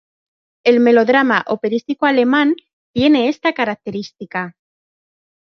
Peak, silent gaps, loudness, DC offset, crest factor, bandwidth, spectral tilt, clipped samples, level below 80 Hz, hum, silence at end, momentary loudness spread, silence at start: -2 dBFS; 2.73-2.94 s; -16 LUFS; under 0.1%; 14 dB; 6.6 kHz; -6 dB/octave; under 0.1%; -58 dBFS; none; 1 s; 14 LU; 0.65 s